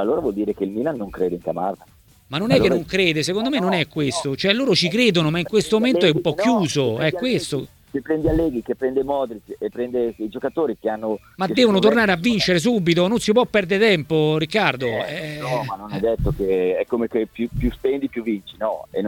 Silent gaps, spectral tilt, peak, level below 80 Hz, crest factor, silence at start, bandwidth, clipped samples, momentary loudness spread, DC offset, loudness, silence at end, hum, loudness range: none; -5.5 dB/octave; 0 dBFS; -40 dBFS; 20 dB; 0 s; 18.5 kHz; under 0.1%; 10 LU; under 0.1%; -20 LUFS; 0 s; none; 5 LU